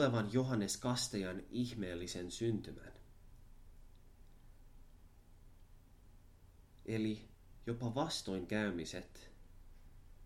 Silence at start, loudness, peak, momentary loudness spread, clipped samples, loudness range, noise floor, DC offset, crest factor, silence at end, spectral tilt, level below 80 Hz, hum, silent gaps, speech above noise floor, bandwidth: 0 s; -40 LUFS; -20 dBFS; 19 LU; under 0.1%; 9 LU; -62 dBFS; under 0.1%; 22 dB; 0 s; -5 dB/octave; -60 dBFS; none; none; 23 dB; 16 kHz